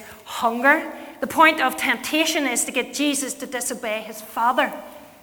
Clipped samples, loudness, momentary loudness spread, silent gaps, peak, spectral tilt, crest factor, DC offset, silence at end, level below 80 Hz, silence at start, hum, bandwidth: under 0.1%; -21 LUFS; 14 LU; none; -2 dBFS; -1 dB/octave; 22 dB; under 0.1%; 0.15 s; -62 dBFS; 0 s; none; over 20 kHz